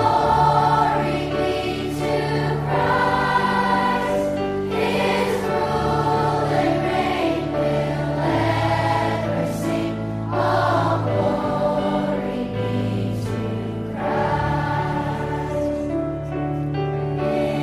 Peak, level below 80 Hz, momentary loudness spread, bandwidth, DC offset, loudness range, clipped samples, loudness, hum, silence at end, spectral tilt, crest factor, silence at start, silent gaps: -6 dBFS; -40 dBFS; 6 LU; 15 kHz; under 0.1%; 3 LU; under 0.1%; -21 LUFS; none; 0 s; -6.5 dB/octave; 16 dB; 0 s; none